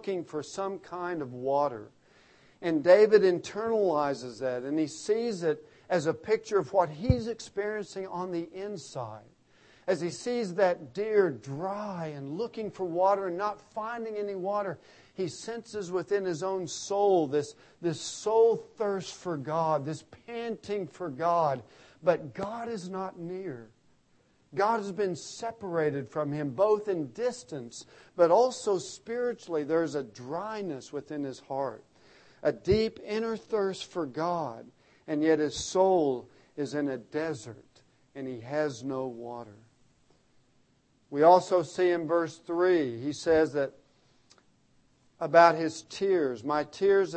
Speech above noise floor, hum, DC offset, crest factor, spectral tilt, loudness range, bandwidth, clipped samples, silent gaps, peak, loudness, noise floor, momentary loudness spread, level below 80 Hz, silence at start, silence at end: 39 dB; none; under 0.1%; 24 dB; -5.5 dB/octave; 8 LU; 8.8 kHz; under 0.1%; none; -6 dBFS; -29 LUFS; -68 dBFS; 14 LU; -56 dBFS; 0 s; 0 s